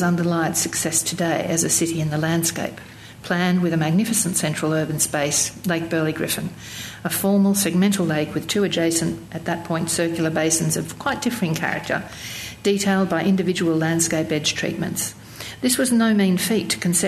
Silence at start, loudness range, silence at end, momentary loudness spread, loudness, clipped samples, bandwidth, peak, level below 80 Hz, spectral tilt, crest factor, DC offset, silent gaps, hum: 0 s; 2 LU; 0 s; 9 LU; -21 LUFS; under 0.1%; 14 kHz; -6 dBFS; -54 dBFS; -4 dB/octave; 16 dB; under 0.1%; none; none